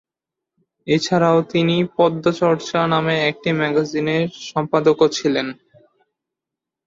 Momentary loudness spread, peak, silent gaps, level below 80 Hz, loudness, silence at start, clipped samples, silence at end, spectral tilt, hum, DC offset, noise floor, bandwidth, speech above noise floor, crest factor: 6 LU; -4 dBFS; none; -60 dBFS; -18 LUFS; 0.85 s; under 0.1%; 1.35 s; -5.5 dB/octave; none; under 0.1%; -85 dBFS; 7.6 kHz; 67 dB; 16 dB